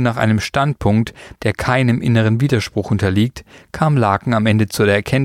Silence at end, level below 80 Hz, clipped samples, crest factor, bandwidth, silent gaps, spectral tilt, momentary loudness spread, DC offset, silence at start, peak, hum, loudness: 0 s; -42 dBFS; under 0.1%; 14 dB; 15.5 kHz; none; -6.5 dB/octave; 6 LU; under 0.1%; 0 s; -2 dBFS; none; -17 LUFS